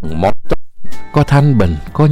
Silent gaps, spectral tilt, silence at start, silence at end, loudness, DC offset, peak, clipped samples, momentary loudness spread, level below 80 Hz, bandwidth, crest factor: none; -8.5 dB/octave; 0 s; 0 s; -14 LUFS; under 0.1%; 0 dBFS; under 0.1%; 12 LU; -28 dBFS; 11 kHz; 10 dB